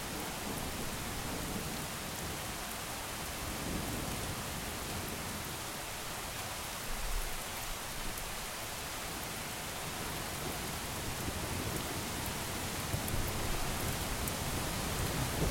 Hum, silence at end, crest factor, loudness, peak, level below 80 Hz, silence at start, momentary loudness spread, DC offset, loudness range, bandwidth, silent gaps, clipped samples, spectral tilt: none; 0 s; 24 dB; -38 LUFS; -14 dBFS; -46 dBFS; 0 s; 3 LU; under 0.1%; 3 LU; 17 kHz; none; under 0.1%; -3 dB/octave